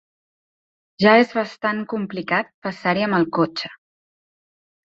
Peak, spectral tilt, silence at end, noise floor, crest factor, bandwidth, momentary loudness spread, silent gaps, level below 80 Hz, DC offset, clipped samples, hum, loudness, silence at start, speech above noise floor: -2 dBFS; -6.5 dB/octave; 1.15 s; under -90 dBFS; 20 dB; 7.6 kHz; 12 LU; 2.54-2.62 s; -64 dBFS; under 0.1%; under 0.1%; none; -20 LUFS; 1 s; over 70 dB